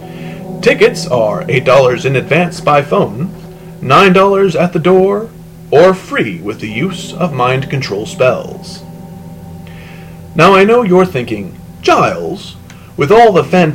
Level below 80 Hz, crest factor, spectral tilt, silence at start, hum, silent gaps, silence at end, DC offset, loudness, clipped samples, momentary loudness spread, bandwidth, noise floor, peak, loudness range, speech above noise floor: -42 dBFS; 12 dB; -6 dB/octave; 0 s; none; none; 0 s; 0.1%; -11 LUFS; 0.4%; 23 LU; 16.5 kHz; -30 dBFS; 0 dBFS; 6 LU; 20 dB